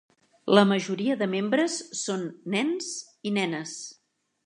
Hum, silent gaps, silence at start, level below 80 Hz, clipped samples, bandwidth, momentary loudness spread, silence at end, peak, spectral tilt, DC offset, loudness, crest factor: none; none; 0.45 s; -78 dBFS; under 0.1%; 11 kHz; 15 LU; 0.55 s; -4 dBFS; -4.5 dB/octave; under 0.1%; -26 LUFS; 24 dB